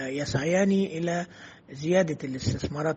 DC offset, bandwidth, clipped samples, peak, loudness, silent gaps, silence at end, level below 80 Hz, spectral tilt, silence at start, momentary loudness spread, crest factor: under 0.1%; 8.4 kHz; under 0.1%; -10 dBFS; -27 LUFS; none; 0 s; -54 dBFS; -6 dB/octave; 0 s; 14 LU; 18 dB